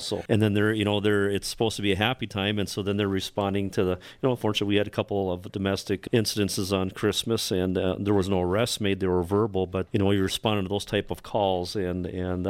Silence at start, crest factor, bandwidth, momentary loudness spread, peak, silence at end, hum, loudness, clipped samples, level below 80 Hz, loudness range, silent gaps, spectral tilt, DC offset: 0 s; 18 dB; 16 kHz; 5 LU; -8 dBFS; 0 s; none; -26 LUFS; under 0.1%; -52 dBFS; 2 LU; none; -5 dB/octave; under 0.1%